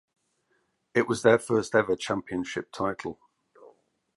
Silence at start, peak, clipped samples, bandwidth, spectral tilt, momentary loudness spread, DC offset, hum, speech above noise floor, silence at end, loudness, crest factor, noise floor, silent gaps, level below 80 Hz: 0.95 s; -6 dBFS; under 0.1%; 11.5 kHz; -5 dB/octave; 11 LU; under 0.1%; none; 47 dB; 0.5 s; -27 LUFS; 22 dB; -73 dBFS; none; -62 dBFS